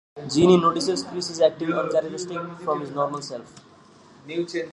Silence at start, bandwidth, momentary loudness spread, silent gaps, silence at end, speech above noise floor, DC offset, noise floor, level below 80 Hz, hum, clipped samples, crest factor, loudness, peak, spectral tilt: 0.15 s; 11 kHz; 15 LU; none; 0.05 s; 28 dB; under 0.1%; -51 dBFS; -58 dBFS; none; under 0.1%; 22 dB; -23 LUFS; -2 dBFS; -5.5 dB/octave